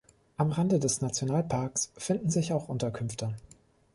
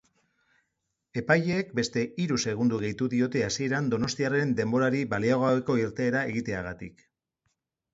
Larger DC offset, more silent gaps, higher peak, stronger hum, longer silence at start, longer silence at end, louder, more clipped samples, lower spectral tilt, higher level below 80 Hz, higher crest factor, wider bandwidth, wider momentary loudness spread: neither; neither; second, -14 dBFS vs -8 dBFS; neither; second, 0.4 s vs 1.15 s; second, 0.55 s vs 1.05 s; second, -30 LUFS vs -27 LUFS; neither; about the same, -5.5 dB/octave vs -5.5 dB/octave; about the same, -60 dBFS vs -58 dBFS; about the same, 16 dB vs 20 dB; first, 11.5 kHz vs 7.8 kHz; about the same, 9 LU vs 9 LU